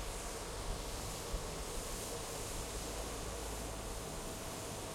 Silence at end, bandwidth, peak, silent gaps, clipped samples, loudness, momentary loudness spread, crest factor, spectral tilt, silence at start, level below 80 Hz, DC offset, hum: 0 s; 16.5 kHz; -28 dBFS; none; under 0.1%; -43 LUFS; 2 LU; 14 dB; -3 dB/octave; 0 s; -48 dBFS; under 0.1%; none